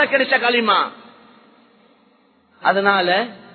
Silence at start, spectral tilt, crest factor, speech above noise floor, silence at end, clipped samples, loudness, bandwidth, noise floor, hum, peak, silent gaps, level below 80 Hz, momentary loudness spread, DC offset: 0 s; -8.5 dB/octave; 20 dB; 39 dB; 0.2 s; under 0.1%; -17 LUFS; 4.6 kHz; -57 dBFS; none; 0 dBFS; none; -72 dBFS; 6 LU; under 0.1%